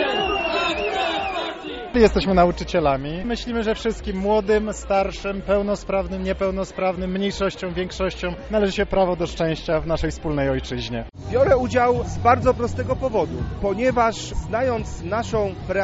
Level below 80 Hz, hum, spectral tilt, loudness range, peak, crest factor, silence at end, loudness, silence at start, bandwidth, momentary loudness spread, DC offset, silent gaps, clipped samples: -36 dBFS; none; -4.5 dB/octave; 3 LU; -2 dBFS; 18 dB; 0 s; -22 LUFS; 0 s; 8 kHz; 9 LU; under 0.1%; none; under 0.1%